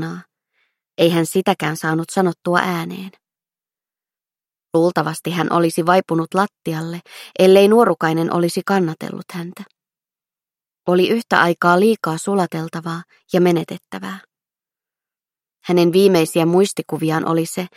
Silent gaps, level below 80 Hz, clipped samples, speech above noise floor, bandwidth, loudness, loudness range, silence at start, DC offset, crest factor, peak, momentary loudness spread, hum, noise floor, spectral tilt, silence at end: none; -66 dBFS; under 0.1%; over 73 dB; 16 kHz; -17 LUFS; 6 LU; 0 s; under 0.1%; 18 dB; 0 dBFS; 16 LU; none; under -90 dBFS; -5.5 dB/octave; 0.1 s